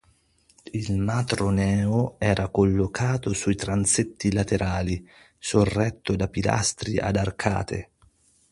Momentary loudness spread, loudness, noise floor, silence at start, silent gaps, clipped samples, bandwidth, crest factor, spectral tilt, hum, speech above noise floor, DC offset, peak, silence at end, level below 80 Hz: 7 LU; -25 LUFS; -62 dBFS; 0.65 s; none; under 0.1%; 11.5 kHz; 20 dB; -5 dB/octave; none; 38 dB; under 0.1%; -4 dBFS; 0.7 s; -42 dBFS